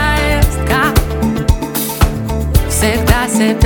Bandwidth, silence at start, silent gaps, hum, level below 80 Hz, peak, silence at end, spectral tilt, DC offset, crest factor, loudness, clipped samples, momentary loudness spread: 19.5 kHz; 0 s; none; none; -18 dBFS; 0 dBFS; 0 s; -5 dB/octave; under 0.1%; 12 dB; -14 LUFS; under 0.1%; 4 LU